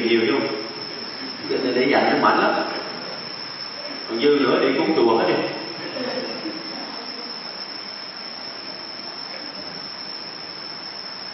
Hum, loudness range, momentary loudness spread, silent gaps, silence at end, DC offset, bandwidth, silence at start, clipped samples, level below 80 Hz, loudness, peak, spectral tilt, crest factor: none; 10 LU; 13 LU; none; 0 s; under 0.1%; 6 kHz; 0 s; under 0.1%; -70 dBFS; -23 LUFS; -4 dBFS; -6.5 dB/octave; 20 dB